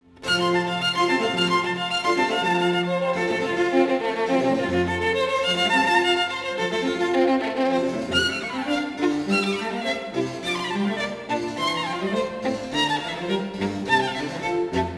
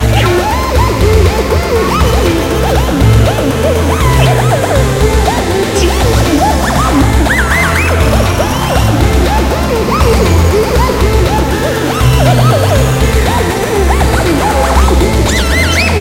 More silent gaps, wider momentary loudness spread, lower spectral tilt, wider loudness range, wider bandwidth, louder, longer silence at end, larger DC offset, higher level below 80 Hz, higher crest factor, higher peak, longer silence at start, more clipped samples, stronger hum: neither; first, 6 LU vs 3 LU; about the same, -4.5 dB/octave vs -5.5 dB/octave; first, 4 LU vs 0 LU; second, 11 kHz vs 16.5 kHz; second, -23 LUFS vs -10 LUFS; about the same, 0 s vs 0 s; second, under 0.1% vs 0.3%; second, -54 dBFS vs -14 dBFS; first, 16 dB vs 8 dB; second, -8 dBFS vs 0 dBFS; first, 0.2 s vs 0 s; second, under 0.1% vs 0.2%; neither